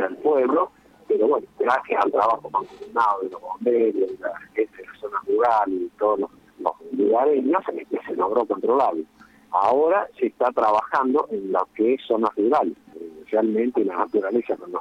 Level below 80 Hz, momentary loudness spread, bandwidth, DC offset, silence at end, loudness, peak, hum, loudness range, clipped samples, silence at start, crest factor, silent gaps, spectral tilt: -68 dBFS; 9 LU; 7.2 kHz; under 0.1%; 0 s; -23 LUFS; -4 dBFS; none; 2 LU; under 0.1%; 0 s; 18 dB; none; -7 dB/octave